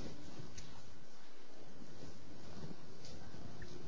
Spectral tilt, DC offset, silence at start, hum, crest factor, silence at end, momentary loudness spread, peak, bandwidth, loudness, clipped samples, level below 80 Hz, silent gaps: -5 dB/octave; 2%; 0 s; none; 18 dB; 0 s; 7 LU; -30 dBFS; 7.6 kHz; -55 LUFS; under 0.1%; -64 dBFS; none